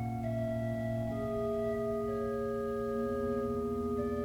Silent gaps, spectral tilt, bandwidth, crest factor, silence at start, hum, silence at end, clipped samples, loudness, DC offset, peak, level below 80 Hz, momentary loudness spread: none; -8.5 dB/octave; 18.5 kHz; 10 dB; 0 s; none; 0 s; under 0.1%; -35 LUFS; under 0.1%; -24 dBFS; -52 dBFS; 2 LU